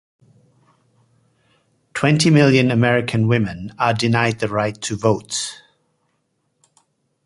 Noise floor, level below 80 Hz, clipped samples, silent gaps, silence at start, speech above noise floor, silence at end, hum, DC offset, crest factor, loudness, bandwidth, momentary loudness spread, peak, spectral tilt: -69 dBFS; -52 dBFS; under 0.1%; none; 1.95 s; 52 dB; 1.7 s; none; under 0.1%; 18 dB; -18 LUFS; 11.5 kHz; 11 LU; -2 dBFS; -5.5 dB/octave